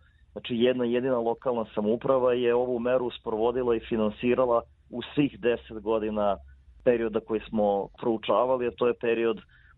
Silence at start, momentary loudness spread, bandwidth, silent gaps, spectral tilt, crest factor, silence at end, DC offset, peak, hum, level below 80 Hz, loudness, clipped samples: 0.35 s; 7 LU; 4.1 kHz; none; -9.5 dB/octave; 18 dB; 0.35 s; under 0.1%; -8 dBFS; none; -54 dBFS; -27 LUFS; under 0.1%